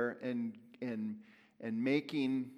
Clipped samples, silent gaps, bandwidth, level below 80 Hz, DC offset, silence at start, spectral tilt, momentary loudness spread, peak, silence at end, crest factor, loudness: under 0.1%; none; 10.5 kHz; -88 dBFS; under 0.1%; 0 s; -7 dB/octave; 11 LU; -20 dBFS; 0 s; 18 dB; -38 LUFS